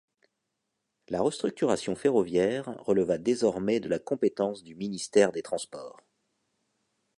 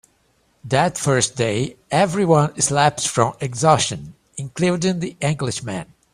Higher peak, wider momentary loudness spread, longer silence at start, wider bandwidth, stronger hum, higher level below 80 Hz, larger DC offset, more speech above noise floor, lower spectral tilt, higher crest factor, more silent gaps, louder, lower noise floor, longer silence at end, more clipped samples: second, -8 dBFS vs 0 dBFS; about the same, 11 LU vs 13 LU; first, 1.1 s vs 0.65 s; second, 11.5 kHz vs 14.5 kHz; neither; second, -66 dBFS vs -52 dBFS; neither; first, 54 dB vs 43 dB; about the same, -5 dB/octave vs -4.5 dB/octave; about the same, 20 dB vs 20 dB; neither; second, -28 LUFS vs -19 LUFS; first, -82 dBFS vs -62 dBFS; first, 1.3 s vs 0.3 s; neither